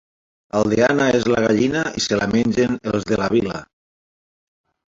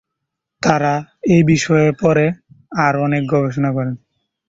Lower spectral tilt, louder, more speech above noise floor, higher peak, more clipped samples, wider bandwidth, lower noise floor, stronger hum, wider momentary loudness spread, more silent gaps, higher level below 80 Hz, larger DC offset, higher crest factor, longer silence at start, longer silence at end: second, -5 dB/octave vs -6.5 dB/octave; second, -19 LUFS vs -16 LUFS; first, over 72 dB vs 63 dB; about the same, -2 dBFS vs 0 dBFS; neither; about the same, 7.8 kHz vs 7.8 kHz; first, under -90 dBFS vs -78 dBFS; neither; second, 6 LU vs 10 LU; neither; about the same, -48 dBFS vs -50 dBFS; neither; about the same, 18 dB vs 16 dB; about the same, 0.55 s vs 0.6 s; first, 1.3 s vs 0.5 s